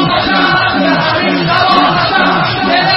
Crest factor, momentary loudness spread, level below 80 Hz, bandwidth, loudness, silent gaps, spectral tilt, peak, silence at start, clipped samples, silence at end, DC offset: 10 dB; 2 LU; -40 dBFS; 6 kHz; -10 LUFS; none; -7 dB/octave; 0 dBFS; 0 s; under 0.1%; 0 s; under 0.1%